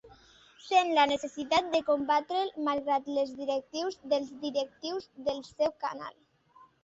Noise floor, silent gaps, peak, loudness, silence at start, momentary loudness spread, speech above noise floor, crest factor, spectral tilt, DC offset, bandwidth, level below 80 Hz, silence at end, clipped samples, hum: -61 dBFS; none; -12 dBFS; -30 LUFS; 0.05 s; 11 LU; 30 dB; 20 dB; -3 dB/octave; under 0.1%; 8 kHz; -70 dBFS; 0.75 s; under 0.1%; none